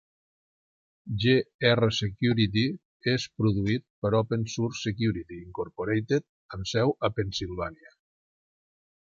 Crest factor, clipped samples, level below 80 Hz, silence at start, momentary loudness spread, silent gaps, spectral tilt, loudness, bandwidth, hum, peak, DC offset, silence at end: 22 dB; under 0.1%; -52 dBFS; 1.05 s; 12 LU; 1.55-1.59 s, 2.85-3.00 s, 3.90-4.02 s, 6.29-6.49 s; -6 dB/octave; -28 LUFS; 7.6 kHz; none; -6 dBFS; under 0.1%; 1.35 s